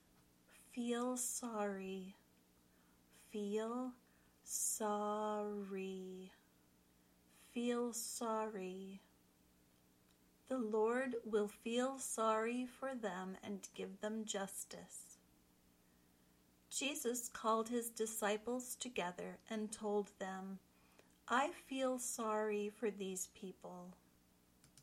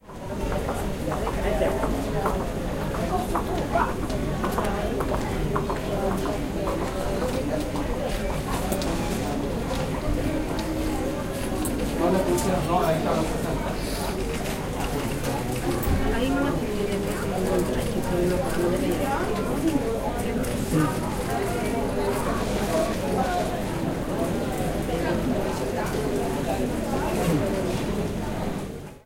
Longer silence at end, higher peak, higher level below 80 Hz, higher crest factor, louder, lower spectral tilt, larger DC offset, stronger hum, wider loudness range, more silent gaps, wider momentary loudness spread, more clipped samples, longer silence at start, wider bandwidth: about the same, 0 s vs 0.05 s; second, -24 dBFS vs -10 dBFS; second, -80 dBFS vs -34 dBFS; about the same, 20 dB vs 16 dB; second, -42 LUFS vs -26 LUFS; second, -3.5 dB/octave vs -5.5 dB/octave; neither; first, 60 Hz at -80 dBFS vs none; first, 6 LU vs 2 LU; neither; first, 14 LU vs 4 LU; neither; first, 0.5 s vs 0.05 s; about the same, 16.5 kHz vs 17 kHz